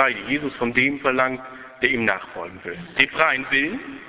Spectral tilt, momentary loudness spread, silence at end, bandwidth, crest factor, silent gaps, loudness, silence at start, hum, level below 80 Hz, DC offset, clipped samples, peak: -7.5 dB/octave; 15 LU; 0 s; 4 kHz; 22 dB; none; -21 LUFS; 0 s; none; -56 dBFS; under 0.1%; under 0.1%; 0 dBFS